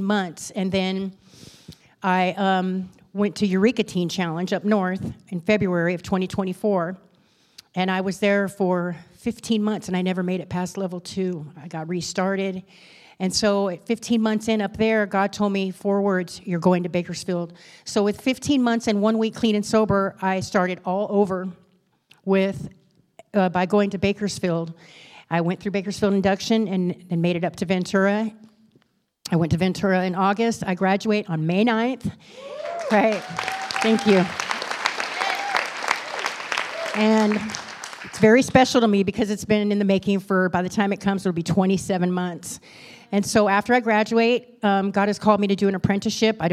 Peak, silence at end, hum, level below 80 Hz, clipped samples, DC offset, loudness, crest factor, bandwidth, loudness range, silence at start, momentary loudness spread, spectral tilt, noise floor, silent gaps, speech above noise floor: -2 dBFS; 0 s; none; -56 dBFS; under 0.1%; under 0.1%; -22 LUFS; 22 dB; 14 kHz; 5 LU; 0 s; 10 LU; -5.5 dB/octave; -63 dBFS; none; 41 dB